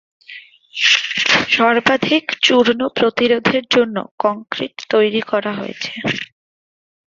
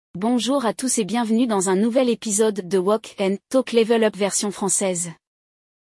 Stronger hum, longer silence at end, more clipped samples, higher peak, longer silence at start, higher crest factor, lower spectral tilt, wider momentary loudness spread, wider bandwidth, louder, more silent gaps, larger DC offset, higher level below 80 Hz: neither; about the same, 0.95 s vs 0.85 s; neither; first, 0 dBFS vs -6 dBFS; first, 0.3 s vs 0.15 s; about the same, 18 dB vs 14 dB; about the same, -3.5 dB/octave vs -4 dB/octave; first, 12 LU vs 4 LU; second, 7.6 kHz vs 12 kHz; first, -16 LUFS vs -21 LUFS; first, 4.11-4.18 s vs none; neither; first, -58 dBFS vs -68 dBFS